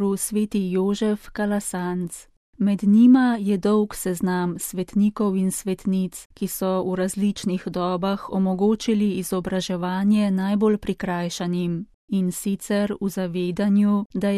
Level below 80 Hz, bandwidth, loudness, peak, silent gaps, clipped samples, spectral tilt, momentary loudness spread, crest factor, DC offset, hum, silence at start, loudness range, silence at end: -52 dBFS; 14.5 kHz; -23 LUFS; -6 dBFS; 2.37-2.53 s, 6.25-6.30 s, 11.94-12.08 s, 14.06-14.10 s; under 0.1%; -6 dB/octave; 7 LU; 16 dB; under 0.1%; none; 0 s; 4 LU; 0 s